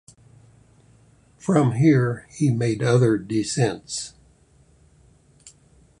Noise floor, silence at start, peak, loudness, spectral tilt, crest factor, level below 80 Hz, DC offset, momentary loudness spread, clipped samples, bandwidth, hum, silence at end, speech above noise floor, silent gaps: -56 dBFS; 1.45 s; -4 dBFS; -21 LUFS; -6.5 dB/octave; 20 dB; -56 dBFS; under 0.1%; 13 LU; under 0.1%; 11 kHz; none; 0.5 s; 36 dB; none